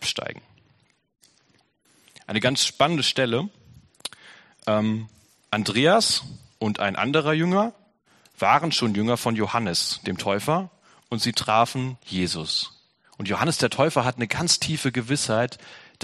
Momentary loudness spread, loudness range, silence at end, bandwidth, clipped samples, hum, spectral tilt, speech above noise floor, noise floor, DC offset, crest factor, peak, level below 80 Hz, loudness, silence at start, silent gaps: 13 LU; 3 LU; 0.2 s; 13 kHz; under 0.1%; none; -4 dB/octave; 41 dB; -64 dBFS; under 0.1%; 22 dB; -4 dBFS; -60 dBFS; -23 LUFS; 0 s; none